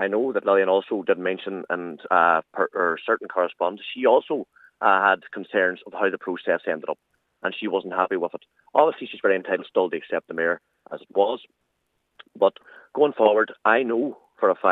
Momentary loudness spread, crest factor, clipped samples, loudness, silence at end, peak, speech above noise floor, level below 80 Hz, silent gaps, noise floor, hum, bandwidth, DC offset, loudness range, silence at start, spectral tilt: 11 LU; 22 dB; under 0.1%; -23 LUFS; 0 s; -2 dBFS; 51 dB; -82 dBFS; none; -74 dBFS; none; 4.1 kHz; under 0.1%; 4 LU; 0 s; -7 dB/octave